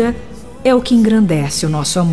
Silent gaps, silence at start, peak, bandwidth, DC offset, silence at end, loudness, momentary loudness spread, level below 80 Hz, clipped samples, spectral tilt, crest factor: none; 0 s; -2 dBFS; 11 kHz; 2%; 0 s; -14 LUFS; 10 LU; -38 dBFS; under 0.1%; -5.5 dB/octave; 12 dB